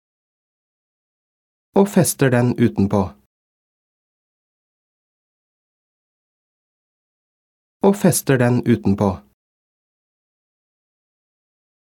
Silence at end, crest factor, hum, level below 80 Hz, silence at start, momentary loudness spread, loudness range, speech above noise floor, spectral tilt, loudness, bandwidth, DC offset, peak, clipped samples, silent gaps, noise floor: 2.7 s; 20 dB; none; -56 dBFS; 1.75 s; 6 LU; 6 LU; over 74 dB; -6 dB/octave; -18 LUFS; 18 kHz; under 0.1%; -2 dBFS; under 0.1%; 3.26-7.80 s; under -90 dBFS